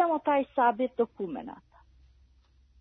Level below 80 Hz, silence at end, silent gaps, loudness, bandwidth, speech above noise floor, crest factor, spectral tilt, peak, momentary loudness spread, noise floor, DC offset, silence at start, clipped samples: -64 dBFS; 1.25 s; none; -29 LUFS; 4 kHz; 34 dB; 20 dB; -8.5 dB/octave; -12 dBFS; 14 LU; -62 dBFS; under 0.1%; 0 s; under 0.1%